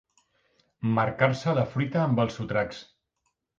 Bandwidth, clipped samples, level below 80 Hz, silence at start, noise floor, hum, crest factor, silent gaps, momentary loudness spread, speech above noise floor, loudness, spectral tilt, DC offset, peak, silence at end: 7.6 kHz; under 0.1%; -58 dBFS; 0.8 s; -78 dBFS; none; 20 dB; none; 9 LU; 52 dB; -27 LUFS; -7.5 dB/octave; under 0.1%; -8 dBFS; 0.75 s